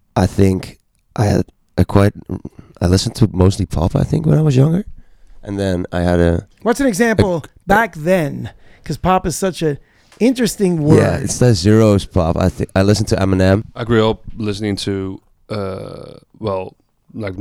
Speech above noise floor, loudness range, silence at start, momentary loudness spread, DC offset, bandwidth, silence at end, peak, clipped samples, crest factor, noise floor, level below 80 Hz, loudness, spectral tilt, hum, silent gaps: 23 dB; 4 LU; 0.15 s; 16 LU; under 0.1%; 16 kHz; 0 s; 0 dBFS; under 0.1%; 16 dB; -39 dBFS; -34 dBFS; -16 LUFS; -6.5 dB/octave; none; none